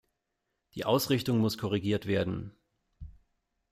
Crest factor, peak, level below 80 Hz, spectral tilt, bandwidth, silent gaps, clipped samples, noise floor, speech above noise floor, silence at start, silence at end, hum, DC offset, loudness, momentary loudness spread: 18 dB; -14 dBFS; -58 dBFS; -6 dB/octave; 15.5 kHz; none; under 0.1%; -83 dBFS; 53 dB; 0.75 s; 0.6 s; none; under 0.1%; -30 LUFS; 13 LU